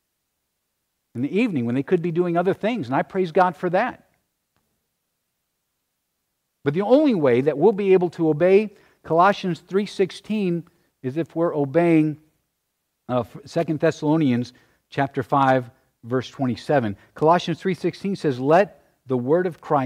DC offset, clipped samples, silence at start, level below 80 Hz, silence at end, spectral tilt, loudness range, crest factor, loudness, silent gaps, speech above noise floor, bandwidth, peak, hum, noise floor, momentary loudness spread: under 0.1%; under 0.1%; 1.15 s; -66 dBFS; 0 s; -7.5 dB/octave; 6 LU; 18 dB; -21 LUFS; none; 56 dB; 11 kHz; -4 dBFS; none; -76 dBFS; 10 LU